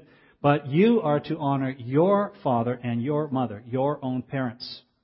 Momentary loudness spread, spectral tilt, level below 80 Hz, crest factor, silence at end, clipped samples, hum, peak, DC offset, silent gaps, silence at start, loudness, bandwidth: 10 LU; -12 dB/octave; -64 dBFS; 18 dB; 0.25 s; under 0.1%; none; -6 dBFS; under 0.1%; none; 0.45 s; -25 LUFS; 5.8 kHz